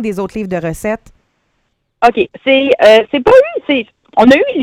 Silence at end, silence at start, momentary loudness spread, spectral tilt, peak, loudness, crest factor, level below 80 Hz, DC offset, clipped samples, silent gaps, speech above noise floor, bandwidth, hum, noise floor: 0 s; 0 s; 12 LU; -5 dB/octave; 0 dBFS; -11 LUFS; 12 dB; -42 dBFS; under 0.1%; 0.6%; none; 54 dB; 14.5 kHz; none; -64 dBFS